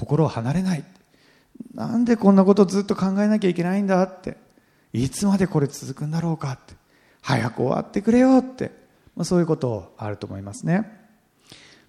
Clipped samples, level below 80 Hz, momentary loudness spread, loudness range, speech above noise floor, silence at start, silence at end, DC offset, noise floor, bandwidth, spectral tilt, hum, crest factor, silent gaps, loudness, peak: under 0.1%; -54 dBFS; 17 LU; 5 LU; 37 dB; 0 s; 1 s; under 0.1%; -58 dBFS; 13.5 kHz; -7 dB/octave; none; 18 dB; none; -22 LUFS; -4 dBFS